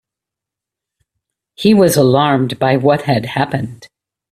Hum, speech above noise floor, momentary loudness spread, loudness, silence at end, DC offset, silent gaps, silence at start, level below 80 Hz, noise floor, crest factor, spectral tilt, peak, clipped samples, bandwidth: none; 71 dB; 9 LU; -13 LUFS; 0.45 s; under 0.1%; none; 1.6 s; -52 dBFS; -84 dBFS; 16 dB; -6 dB/octave; 0 dBFS; under 0.1%; 16 kHz